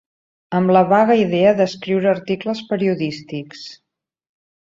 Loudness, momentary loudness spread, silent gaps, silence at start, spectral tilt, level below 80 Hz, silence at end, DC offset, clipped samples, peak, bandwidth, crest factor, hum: -17 LUFS; 16 LU; none; 0.5 s; -7 dB/octave; -62 dBFS; 1.05 s; under 0.1%; under 0.1%; -2 dBFS; 7.6 kHz; 16 dB; none